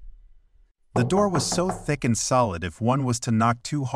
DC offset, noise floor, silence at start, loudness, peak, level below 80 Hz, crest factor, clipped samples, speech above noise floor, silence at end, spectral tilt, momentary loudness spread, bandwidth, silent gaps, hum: under 0.1%; -58 dBFS; 0 s; -24 LUFS; -8 dBFS; -48 dBFS; 16 dB; under 0.1%; 35 dB; 0 s; -5 dB/octave; 5 LU; 13.5 kHz; none; none